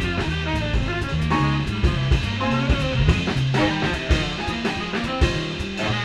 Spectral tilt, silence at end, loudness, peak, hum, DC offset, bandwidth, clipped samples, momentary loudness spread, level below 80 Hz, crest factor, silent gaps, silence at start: -6 dB/octave; 0 s; -22 LUFS; -4 dBFS; none; 0.1%; 11.5 kHz; under 0.1%; 5 LU; -28 dBFS; 18 dB; none; 0 s